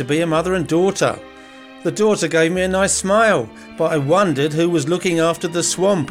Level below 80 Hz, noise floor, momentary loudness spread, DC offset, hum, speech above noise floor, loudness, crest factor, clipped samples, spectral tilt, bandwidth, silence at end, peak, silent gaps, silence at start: -46 dBFS; -40 dBFS; 6 LU; under 0.1%; none; 23 dB; -17 LUFS; 14 dB; under 0.1%; -4.5 dB/octave; 16 kHz; 0 s; -4 dBFS; none; 0 s